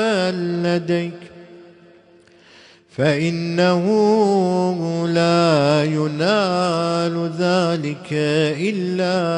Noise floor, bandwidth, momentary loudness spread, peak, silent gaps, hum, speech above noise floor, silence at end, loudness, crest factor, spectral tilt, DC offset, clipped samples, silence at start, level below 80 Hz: -50 dBFS; 10.5 kHz; 7 LU; -2 dBFS; none; none; 32 dB; 0 s; -19 LUFS; 16 dB; -6 dB/octave; under 0.1%; under 0.1%; 0 s; -62 dBFS